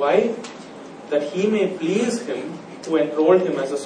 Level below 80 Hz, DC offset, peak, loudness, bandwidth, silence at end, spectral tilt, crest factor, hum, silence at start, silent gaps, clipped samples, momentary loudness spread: -72 dBFS; under 0.1%; -4 dBFS; -21 LUFS; 10 kHz; 0 s; -5.5 dB/octave; 18 dB; none; 0 s; none; under 0.1%; 18 LU